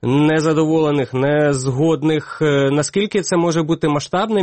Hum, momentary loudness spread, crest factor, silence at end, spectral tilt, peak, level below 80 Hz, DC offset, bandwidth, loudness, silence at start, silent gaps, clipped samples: none; 3 LU; 10 dB; 0 s; -6 dB/octave; -6 dBFS; -50 dBFS; 0.2%; 8.8 kHz; -17 LUFS; 0.05 s; none; under 0.1%